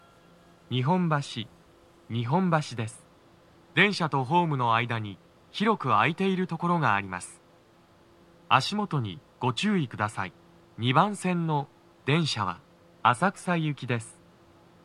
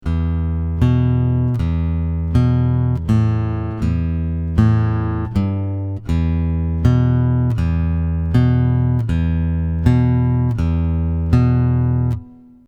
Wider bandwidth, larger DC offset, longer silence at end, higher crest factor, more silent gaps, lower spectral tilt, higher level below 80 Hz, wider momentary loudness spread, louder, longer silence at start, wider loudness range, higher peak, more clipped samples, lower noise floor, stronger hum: first, 11.5 kHz vs 5.6 kHz; neither; first, 0.75 s vs 0.35 s; first, 24 dB vs 16 dB; neither; second, -5.5 dB/octave vs -9.5 dB/octave; second, -70 dBFS vs -26 dBFS; first, 14 LU vs 6 LU; second, -27 LUFS vs -18 LUFS; first, 0.7 s vs 0.05 s; about the same, 4 LU vs 2 LU; second, -4 dBFS vs 0 dBFS; neither; first, -58 dBFS vs -37 dBFS; neither